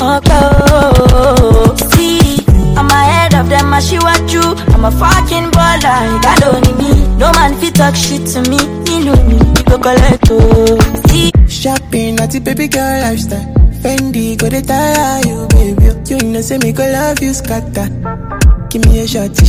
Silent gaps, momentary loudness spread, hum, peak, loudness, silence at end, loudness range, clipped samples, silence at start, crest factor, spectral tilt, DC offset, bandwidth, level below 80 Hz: none; 7 LU; none; 0 dBFS; -10 LUFS; 0 s; 5 LU; 4%; 0 s; 8 dB; -5 dB/octave; under 0.1%; 16.5 kHz; -14 dBFS